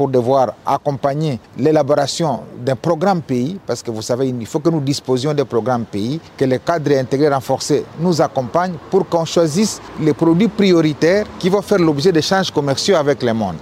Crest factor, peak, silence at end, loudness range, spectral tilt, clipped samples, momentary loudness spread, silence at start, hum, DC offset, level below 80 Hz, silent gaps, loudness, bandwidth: 16 dB; 0 dBFS; 0 s; 4 LU; -5.5 dB/octave; under 0.1%; 7 LU; 0 s; none; under 0.1%; -52 dBFS; none; -17 LUFS; 16 kHz